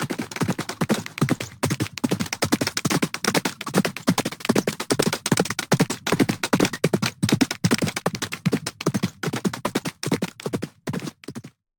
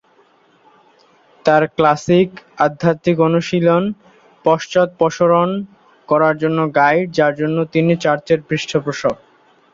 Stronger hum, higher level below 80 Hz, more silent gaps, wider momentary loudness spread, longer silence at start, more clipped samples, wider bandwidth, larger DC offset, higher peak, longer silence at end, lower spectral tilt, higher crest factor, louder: neither; about the same, -56 dBFS vs -56 dBFS; neither; about the same, 7 LU vs 7 LU; second, 0 s vs 1.45 s; neither; first, over 20 kHz vs 7.6 kHz; neither; second, -4 dBFS vs 0 dBFS; second, 0.3 s vs 0.6 s; second, -4.5 dB/octave vs -6.5 dB/octave; about the same, 20 dB vs 16 dB; second, -24 LUFS vs -16 LUFS